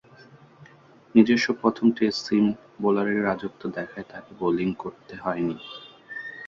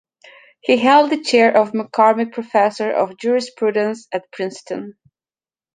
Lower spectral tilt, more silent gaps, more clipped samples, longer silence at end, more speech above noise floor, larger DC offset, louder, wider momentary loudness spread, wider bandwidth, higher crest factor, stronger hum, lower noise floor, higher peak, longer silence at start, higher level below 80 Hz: first, -6 dB/octave vs -4.5 dB/octave; neither; neither; second, 0 s vs 0.85 s; second, 29 dB vs over 73 dB; neither; second, -24 LUFS vs -17 LUFS; first, 17 LU vs 14 LU; second, 7.4 kHz vs 9.6 kHz; first, 22 dB vs 16 dB; neither; second, -53 dBFS vs under -90 dBFS; about the same, -4 dBFS vs -2 dBFS; first, 1.15 s vs 0.65 s; first, -62 dBFS vs -70 dBFS